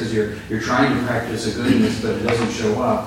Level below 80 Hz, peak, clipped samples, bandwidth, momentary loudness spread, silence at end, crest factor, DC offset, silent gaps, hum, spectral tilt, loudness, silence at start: -42 dBFS; -4 dBFS; under 0.1%; 16.5 kHz; 6 LU; 0 s; 16 dB; under 0.1%; none; none; -5.5 dB/octave; -20 LUFS; 0 s